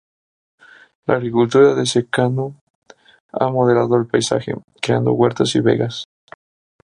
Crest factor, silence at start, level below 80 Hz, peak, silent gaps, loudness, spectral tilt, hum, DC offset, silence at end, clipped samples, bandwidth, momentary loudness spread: 16 dB; 1.1 s; -58 dBFS; -2 dBFS; 2.61-2.82 s, 3.20-3.29 s, 4.64-4.68 s; -17 LUFS; -5.5 dB/octave; none; under 0.1%; 0.8 s; under 0.1%; 11.5 kHz; 15 LU